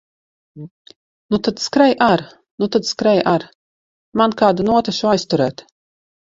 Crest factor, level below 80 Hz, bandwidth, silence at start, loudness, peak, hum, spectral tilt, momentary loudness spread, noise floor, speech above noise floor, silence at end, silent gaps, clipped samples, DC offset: 18 dB; -54 dBFS; 7.8 kHz; 0.55 s; -17 LUFS; 0 dBFS; none; -5 dB/octave; 10 LU; under -90 dBFS; over 73 dB; 0.8 s; 0.71-0.85 s, 0.96-1.29 s, 2.51-2.58 s, 3.55-4.12 s; under 0.1%; under 0.1%